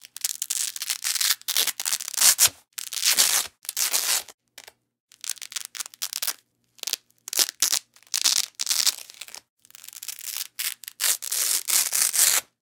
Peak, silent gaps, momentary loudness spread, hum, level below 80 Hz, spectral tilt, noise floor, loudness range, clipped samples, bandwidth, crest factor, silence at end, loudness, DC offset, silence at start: 0 dBFS; 4.34-4.38 s, 5.00-5.08 s, 9.50-9.57 s; 16 LU; none; -76 dBFS; 3.5 dB/octave; -57 dBFS; 7 LU; under 0.1%; 19 kHz; 26 dB; 0.2 s; -22 LUFS; under 0.1%; 0.25 s